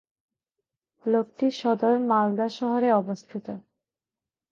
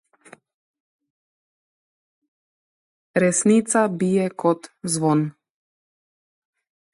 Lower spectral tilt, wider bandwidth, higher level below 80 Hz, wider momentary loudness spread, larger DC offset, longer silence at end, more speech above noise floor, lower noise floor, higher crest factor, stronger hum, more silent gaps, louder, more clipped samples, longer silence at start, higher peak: first, -7 dB/octave vs -5.5 dB/octave; second, 7.2 kHz vs 11.5 kHz; second, -78 dBFS vs -70 dBFS; first, 14 LU vs 9 LU; neither; second, 0.95 s vs 1.65 s; first, over 66 dB vs 31 dB; first, under -90 dBFS vs -51 dBFS; about the same, 18 dB vs 20 dB; neither; neither; second, -25 LUFS vs -21 LUFS; neither; second, 1.05 s vs 3.15 s; second, -10 dBFS vs -6 dBFS